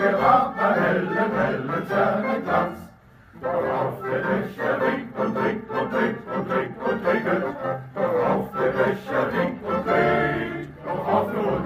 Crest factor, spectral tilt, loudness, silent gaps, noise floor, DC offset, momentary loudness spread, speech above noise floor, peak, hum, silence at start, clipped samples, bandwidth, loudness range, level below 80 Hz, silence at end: 18 dB; -7.5 dB/octave; -24 LUFS; none; -49 dBFS; under 0.1%; 8 LU; 26 dB; -4 dBFS; none; 0 s; under 0.1%; 15.5 kHz; 2 LU; -54 dBFS; 0 s